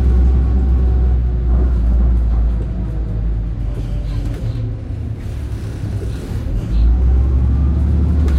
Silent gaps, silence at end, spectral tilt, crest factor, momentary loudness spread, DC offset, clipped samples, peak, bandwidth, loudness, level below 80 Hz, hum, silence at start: none; 0 s; -9 dB/octave; 10 dB; 9 LU; under 0.1%; under 0.1%; -4 dBFS; 4.5 kHz; -18 LUFS; -16 dBFS; none; 0 s